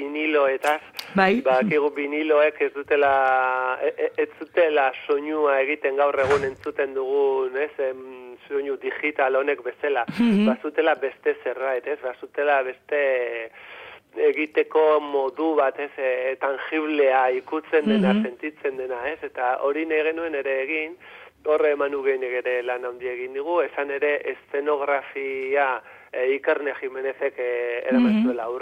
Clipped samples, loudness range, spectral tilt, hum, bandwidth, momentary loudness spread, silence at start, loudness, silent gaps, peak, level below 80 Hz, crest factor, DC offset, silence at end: under 0.1%; 4 LU; -6.5 dB/octave; none; 14 kHz; 10 LU; 0 s; -23 LUFS; none; -2 dBFS; -66 dBFS; 20 dB; under 0.1%; 0 s